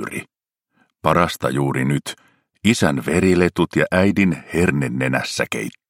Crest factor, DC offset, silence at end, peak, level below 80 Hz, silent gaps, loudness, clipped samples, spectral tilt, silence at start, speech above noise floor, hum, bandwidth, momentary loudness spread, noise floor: 20 dB; under 0.1%; 0.2 s; 0 dBFS; -48 dBFS; none; -19 LUFS; under 0.1%; -5.5 dB/octave; 0 s; 52 dB; none; 16.5 kHz; 8 LU; -70 dBFS